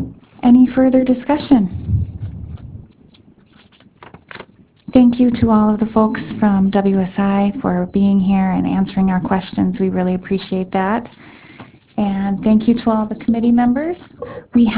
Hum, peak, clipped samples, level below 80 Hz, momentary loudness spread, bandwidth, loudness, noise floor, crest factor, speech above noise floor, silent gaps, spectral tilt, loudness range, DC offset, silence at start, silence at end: none; 0 dBFS; under 0.1%; -38 dBFS; 17 LU; 4 kHz; -16 LUFS; -49 dBFS; 16 dB; 34 dB; none; -12 dB/octave; 6 LU; under 0.1%; 0 s; 0 s